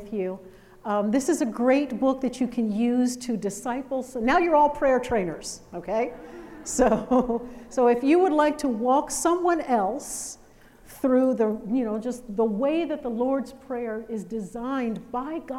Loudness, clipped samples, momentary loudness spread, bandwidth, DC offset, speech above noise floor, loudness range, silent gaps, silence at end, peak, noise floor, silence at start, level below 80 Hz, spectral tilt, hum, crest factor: -25 LUFS; under 0.1%; 12 LU; 15.5 kHz; under 0.1%; 27 dB; 4 LU; none; 0 s; -8 dBFS; -51 dBFS; 0 s; -52 dBFS; -5 dB/octave; none; 18 dB